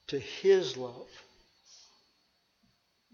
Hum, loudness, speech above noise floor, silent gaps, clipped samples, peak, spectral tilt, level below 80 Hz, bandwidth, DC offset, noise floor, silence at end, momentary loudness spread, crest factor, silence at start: none; -29 LUFS; 43 dB; none; under 0.1%; -14 dBFS; -4.5 dB/octave; -74 dBFS; 7 kHz; under 0.1%; -73 dBFS; 1.95 s; 24 LU; 20 dB; 0.1 s